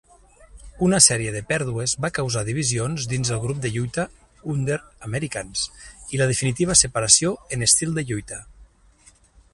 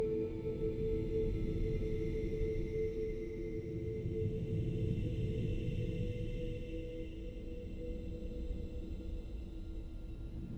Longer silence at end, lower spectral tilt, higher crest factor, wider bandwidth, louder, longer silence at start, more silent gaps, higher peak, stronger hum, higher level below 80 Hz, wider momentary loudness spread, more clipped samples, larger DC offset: first, 0.9 s vs 0 s; second, -3 dB/octave vs -9 dB/octave; first, 24 dB vs 14 dB; first, 11.5 kHz vs 8.2 kHz; first, -21 LUFS vs -40 LUFS; first, 0.4 s vs 0 s; neither; first, 0 dBFS vs -24 dBFS; neither; about the same, -46 dBFS vs -42 dBFS; first, 15 LU vs 10 LU; neither; neither